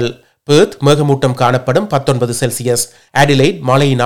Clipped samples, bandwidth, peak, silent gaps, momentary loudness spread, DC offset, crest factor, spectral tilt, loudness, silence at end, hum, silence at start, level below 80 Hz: 0.3%; 17.5 kHz; 0 dBFS; none; 6 LU; under 0.1%; 12 dB; -5 dB/octave; -13 LUFS; 0 s; none; 0 s; -48 dBFS